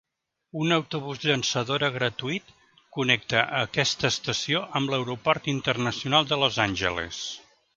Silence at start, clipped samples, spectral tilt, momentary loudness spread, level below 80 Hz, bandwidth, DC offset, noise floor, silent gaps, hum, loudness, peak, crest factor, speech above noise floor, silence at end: 0.55 s; under 0.1%; -3.5 dB/octave; 10 LU; -56 dBFS; 9.2 kHz; under 0.1%; -59 dBFS; none; none; -25 LUFS; -4 dBFS; 24 dB; 33 dB; 0.35 s